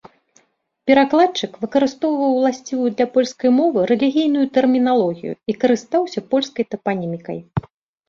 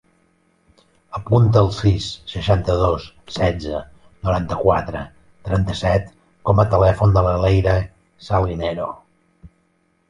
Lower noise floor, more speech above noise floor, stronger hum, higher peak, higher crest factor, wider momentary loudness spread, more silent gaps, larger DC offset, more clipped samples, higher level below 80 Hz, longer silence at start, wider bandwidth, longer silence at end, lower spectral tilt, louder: second, -59 dBFS vs -63 dBFS; second, 42 dB vs 46 dB; neither; about the same, -2 dBFS vs -2 dBFS; about the same, 16 dB vs 18 dB; second, 11 LU vs 17 LU; neither; neither; neither; second, -56 dBFS vs -32 dBFS; second, 0.85 s vs 1.1 s; second, 7.4 kHz vs 9.8 kHz; second, 0.5 s vs 0.65 s; second, -6 dB/octave vs -7.5 dB/octave; about the same, -18 LUFS vs -19 LUFS